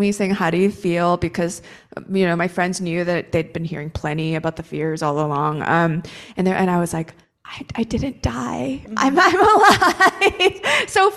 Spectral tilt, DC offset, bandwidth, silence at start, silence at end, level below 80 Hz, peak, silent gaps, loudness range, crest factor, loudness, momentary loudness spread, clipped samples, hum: -5 dB/octave; under 0.1%; 14 kHz; 0 s; 0 s; -44 dBFS; -2 dBFS; none; 6 LU; 18 dB; -19 LUFS; 14 LU; under 0.1%; none